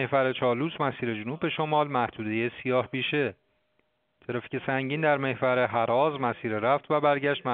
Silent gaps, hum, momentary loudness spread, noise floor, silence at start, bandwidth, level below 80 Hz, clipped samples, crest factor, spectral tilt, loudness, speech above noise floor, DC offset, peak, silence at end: none; none; 7 LU; -73 dBFS; 0 s; 4.6 kHz; -68 dBFS; under 0.1%; 18 dB; -4 dB/octave; -27 LUFS; 46 dB; under 0.1%; -8 dBFS; 0 s